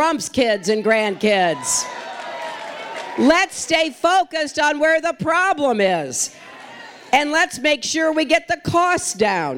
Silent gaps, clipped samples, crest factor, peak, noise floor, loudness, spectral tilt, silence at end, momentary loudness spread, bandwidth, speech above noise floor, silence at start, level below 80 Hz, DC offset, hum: none; under 0.1%; 18 dB; 0 dBFS; -39 dBFS; -18 LUFS; -2.5 dB/octave; 0 s; 13 LU; 17 kHz; 20 dB; 0 s; -54 dBFS; under 0.1%; none